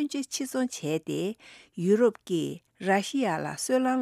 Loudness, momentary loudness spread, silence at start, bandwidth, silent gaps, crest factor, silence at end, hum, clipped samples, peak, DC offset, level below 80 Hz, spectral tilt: -28 LUFS; 11 LU; 0 s; 15.5 kHz; none; 18 dB; 0 s; none; under 0.1%; -10 dBFS; under 0.1%; -74 dBFS; -5 dB/octave